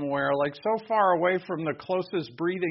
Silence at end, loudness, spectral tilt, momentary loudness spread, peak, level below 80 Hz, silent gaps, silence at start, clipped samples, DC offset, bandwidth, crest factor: 0 s; -27 LUFS; -4.5 dB/octave; 8 LU; -10 dBFS; -68 dBFS; none; 0 s; under 0.1%; under 0.1%; 5.8 kHz; 16 dB